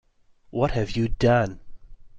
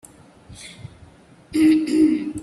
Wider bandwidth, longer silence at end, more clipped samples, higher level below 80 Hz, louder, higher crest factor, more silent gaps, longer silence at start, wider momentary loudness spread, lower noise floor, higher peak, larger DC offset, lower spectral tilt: second, 7.8 kHz vs 12 kHz; about the same, 0 s vs 0 s; neither; first, -38 dBFS vs -54 dBFS; second, -24 LUFS vs -18 LUFS; about the same, 16 dB vs 14 dB; neither; about the same, 0.55 s vs 0.5 s; second, 9 LU vs 23 LU; first, -57 dBFS vs -48 dBFS; second, -10 dBFS vs -6 dBFS; neither; first, -7 dB/octave vs -5.5 dB/octave